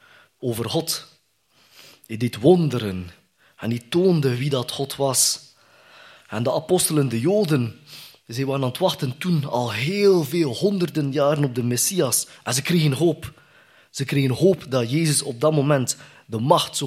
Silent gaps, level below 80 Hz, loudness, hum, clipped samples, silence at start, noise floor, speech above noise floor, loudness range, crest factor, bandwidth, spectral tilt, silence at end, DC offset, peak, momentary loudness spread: none; -62 dBFS; -21 LUFS; none; under 0.1%; 0.4 s; -61 dBFS; 40 dB; 3 LU; 20 dB; 16 kHz; -5 dB/octave; 0 s; under 0.1%; -2 dBFS; 12 LU